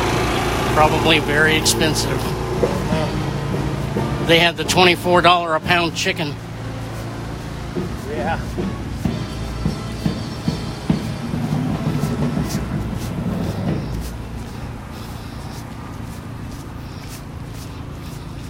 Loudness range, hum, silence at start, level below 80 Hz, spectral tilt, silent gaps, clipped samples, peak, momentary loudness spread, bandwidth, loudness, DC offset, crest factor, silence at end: 14 LU; none; 0 s; -34 dBFS; -4.5 dB/octave; none; under 0.1%; 0 dBFS; 18 LU; 16 kHz; -19 LUFS; under 0.1%; 20 dB; 0 s